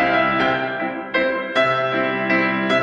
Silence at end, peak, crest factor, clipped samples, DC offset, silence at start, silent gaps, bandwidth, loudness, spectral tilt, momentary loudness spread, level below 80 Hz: 0 s; -4 dBFS; 14 dB; under 0.1%; under 0.1%; 0 s; none; 9.4 kHz; -19 LUFS; -6 dB/octave; 5 LU; -54 dBFS